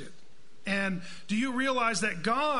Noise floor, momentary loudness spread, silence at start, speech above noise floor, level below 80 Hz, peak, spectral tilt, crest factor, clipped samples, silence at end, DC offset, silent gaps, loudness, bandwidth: -61 dBFS; 12 LU; 0 s; 32 dB; -62 dBFS; -14 dBFS; -4 dB/octave; 16 dB; under 0.1%; 0 s; 1%; none; -30 LUFS; 11 kHz